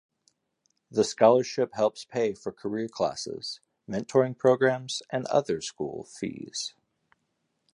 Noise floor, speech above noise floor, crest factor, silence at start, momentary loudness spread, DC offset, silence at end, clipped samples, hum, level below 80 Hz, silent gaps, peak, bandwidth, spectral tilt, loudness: -77 dBFS; 50 dB; 22 dB; 0.9 s; 14 LU; under 0.1%; 1.05 s; under 0.1%; none; -68 dBFS; none; -6 dBFS; 11 kHz; -4.5 dB/octave; -28 LUFS